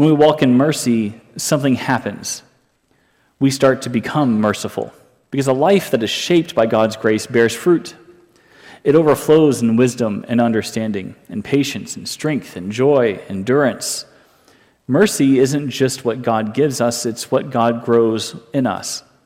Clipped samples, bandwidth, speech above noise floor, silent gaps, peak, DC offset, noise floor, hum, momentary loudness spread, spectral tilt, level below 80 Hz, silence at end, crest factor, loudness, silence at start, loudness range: under 0.1%; 16.5 kHz; 44 dB; none; -2 dBFS; under 0.1%; -60 dBFS; none; 12 LU; -5 dB/octave; -58 dBFS; 0.25 s; 14 dB; -17 LUFS; 0 s; 3 LU